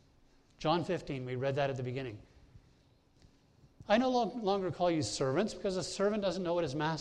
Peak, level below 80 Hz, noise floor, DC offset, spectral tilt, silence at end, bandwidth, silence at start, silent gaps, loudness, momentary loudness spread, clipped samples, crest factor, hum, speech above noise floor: -16 dBFS; -62 dBFS; -66 dBFS; under 0.1%; -5.5 dB/octave; 0 s; 11 kHz; 0.6 s; none; -34 LUFS; 8 LU; under 0.1%; 20 dB; none; 33 dB